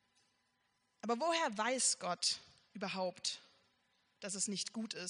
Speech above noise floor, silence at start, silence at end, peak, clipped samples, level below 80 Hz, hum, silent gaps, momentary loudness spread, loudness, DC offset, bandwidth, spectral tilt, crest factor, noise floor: 42 dB; 1.05 s; 0 s; -20 dBFS; under 0.1%; -88 dBFS; none; none; 14 LU; -37 LUFS; under 0.1%; 10.5 kHz; -1.5 dB/octave; 20 dB; -80 dBFS